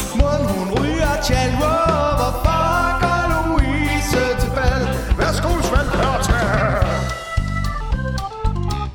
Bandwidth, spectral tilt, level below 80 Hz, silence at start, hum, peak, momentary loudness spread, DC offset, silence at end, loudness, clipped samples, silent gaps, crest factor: 18.5 kHz; -5.5 dB/octave; -24 dBFS; 0 s; none; 0 dBFS; 6 LU; under 0.1%; 0 s; -19 LUFS; under 0.1%; none; 18 dB